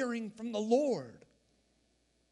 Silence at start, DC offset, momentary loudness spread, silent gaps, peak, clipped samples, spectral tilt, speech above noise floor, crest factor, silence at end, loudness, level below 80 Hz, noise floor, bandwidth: 0 s; under 0.1%; 9 LU; none; -16 dBFS; under 0.1%; -5.5 dB/octave; 41 dB; 20 dB; 1.15 s; -34 LUFS; -78 dBFS; -74 dBFS; 11 kHz